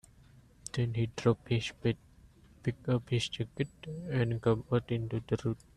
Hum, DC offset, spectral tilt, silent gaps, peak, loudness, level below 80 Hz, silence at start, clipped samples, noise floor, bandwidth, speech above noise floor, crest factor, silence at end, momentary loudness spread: none; under 0.1%; -6.5 dB/octave; none; -14 dBFS; -34 LUFS; -58 dBFS; 0.65 s; under 0.1%; -59 dBFS; 10.5 kHz; 27 dB; 20 dB; 0.2 s; 8 LU